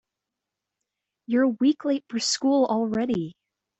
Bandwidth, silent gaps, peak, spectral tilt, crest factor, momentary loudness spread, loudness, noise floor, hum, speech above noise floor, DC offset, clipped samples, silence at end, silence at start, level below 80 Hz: 8.2 kHz; none; -10 dBFS; -4 dB/octave; 16 dB; 6 LU; -24 LUFS; -86 dBFS; none; 62 dB; under 0.1%; under 0.1%; 0.5 s; 1.3 s; -66 dBFS